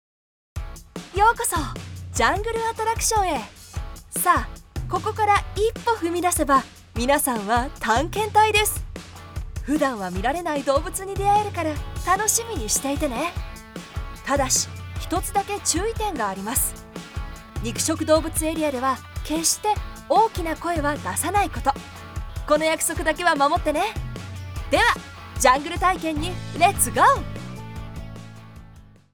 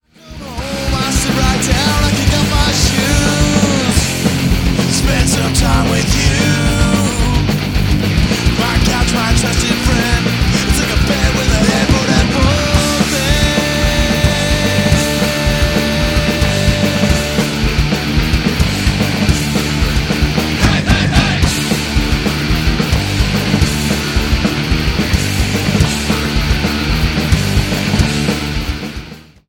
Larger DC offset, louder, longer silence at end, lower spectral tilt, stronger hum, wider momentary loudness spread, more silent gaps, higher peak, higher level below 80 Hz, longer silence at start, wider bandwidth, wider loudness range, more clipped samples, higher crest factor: neither; second, -22 LUFS vs -13 LUFS; about the same, 0.3 s vs 0.25 s; about the same, -3.5 dB/octave vs -4.5 dB/octave; neither; first, 17 LU vs 3 LU; neither; second, -4 dBFS vs 0 dBFS; second, -36 dBFS vs -20 dBFS; first, 0.55 s vs 0.25 s; first, over 20 kHz vs 17.5 kHz; about the same, 3 LU vs 2 LU; neither; first, 20 dB vs 14 dB